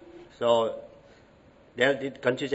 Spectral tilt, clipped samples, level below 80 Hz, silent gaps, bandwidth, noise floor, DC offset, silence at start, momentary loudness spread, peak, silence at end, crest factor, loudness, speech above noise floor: -4.5 dB/octave; under 0.1%; -66 dBFS; none; 8 kHz; -56 dBFS; under 0.1%; 0 s; 14 LU; -8 dBFS; 0 s; 22 dB; -27 LUFS; 30 dB